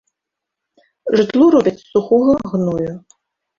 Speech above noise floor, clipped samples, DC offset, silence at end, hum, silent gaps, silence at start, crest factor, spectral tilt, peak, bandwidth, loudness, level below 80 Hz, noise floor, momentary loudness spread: 67 dB; under 0.1%; under 0.1%; 0.6 s; none; none; 1.05 s; 14 dB; -7.5 dB/octave; -2 dBFS; 7.4 kHz; -15 LUFS; -50 dBFS; -82 dBFS; 14 LU